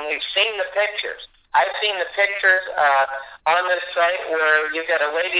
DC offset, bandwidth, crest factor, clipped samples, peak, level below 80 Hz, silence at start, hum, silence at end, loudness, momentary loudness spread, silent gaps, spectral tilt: under 0.1%; 4 kHz; 16 dB; under 0.1%; -4 dBFS; -64 dBFS; 0 s; none; 0 s; -19 LUFS; 6 LU; none; -4 dB/octave